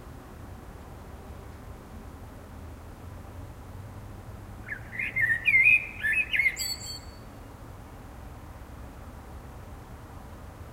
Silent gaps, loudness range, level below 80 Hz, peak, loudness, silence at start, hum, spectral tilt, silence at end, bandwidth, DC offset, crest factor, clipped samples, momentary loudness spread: none; 21 LU; -48 dBFS; -10 dBFS; -24 LUFS; 0 s; none; -2.5 dB/octave; 0 s; 16 kHz; under 0.1%; 22 dB; under 0.1%; 23 LU